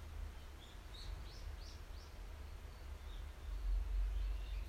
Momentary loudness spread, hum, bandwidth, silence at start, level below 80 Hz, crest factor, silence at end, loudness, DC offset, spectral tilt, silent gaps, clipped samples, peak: 11 LU; none; 14.5 kHz; 0 s; -44 dBFS; 14 dB; 0 s; -49 LUFS; under 0.1%; -5 dB/octave; none; under 0.1%; -32 dBFS